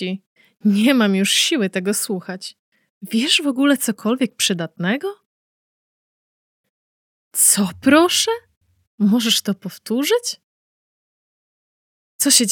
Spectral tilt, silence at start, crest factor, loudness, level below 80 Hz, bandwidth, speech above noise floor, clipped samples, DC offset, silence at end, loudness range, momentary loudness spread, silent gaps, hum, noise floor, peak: -3 dB/octave; 0 s; 20 dB; -18 LUFS; -68 dBFS; 19.5 kHz; over 72 dB; under 0.1%; under 0.1%; 0 s; 6 LU; 14 LU; 0.27-0.36 s, 2.59-2.72 s, 2.90-3.01 s, 5.26-6.64 s, 6.70-7.31 s, 8.57-8.61 s, 8.87-8.98 s, 10.44-12.19 s; none; under -90 dBFS; 0 dBFS